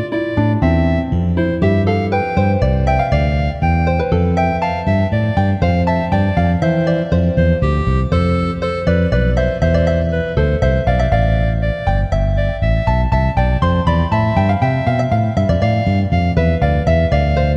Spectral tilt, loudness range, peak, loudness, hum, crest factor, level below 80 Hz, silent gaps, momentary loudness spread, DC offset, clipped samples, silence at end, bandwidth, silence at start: -8.5 dB/octave; 1 LU; -2 dBFS; -16 LUFS; none; 14 dB; -22 dBFS; none; 3 LU; under 0.1%; under 0.1%; 0 s; 7.6 kHz; 0 s